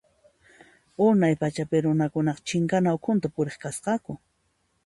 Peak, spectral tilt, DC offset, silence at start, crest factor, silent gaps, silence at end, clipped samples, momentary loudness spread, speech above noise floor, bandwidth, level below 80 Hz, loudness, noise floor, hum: -10 dBFS; -6.5 dB/octave; under 0.1%; 1 s; 16 dB; none; 0.7 s; under 0.1%; 10 LU; 47 dB; 11.5 kHz; -62 dBFS; -25 LUFS; -71 dBFS; none